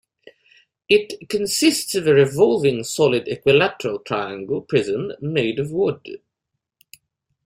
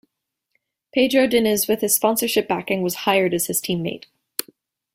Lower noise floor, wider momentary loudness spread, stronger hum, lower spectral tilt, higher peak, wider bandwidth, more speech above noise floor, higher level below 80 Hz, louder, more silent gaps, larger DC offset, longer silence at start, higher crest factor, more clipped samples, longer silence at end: about the same, -80 dBFS vs -79 dBFS; second, 10 LU vs 13 LU; neither; about the same, -4.5 dB/octave vs -3.5 dB/octave; about the same, -2 dBFS vs 0 dBFS; about the same, 16 kHz vs 16.5 kHz; about the same, 61 dB vs 59 dB; about the same, -58 dBFS vs -60 dBFS; about the same, -19 LUFS vs -20 LUFS; neither; neither; about the same, 0.9 s vs 0.95 s; about the same, 20 dB vs 22 dB; neither; first, 1.3 s vs 0.95 s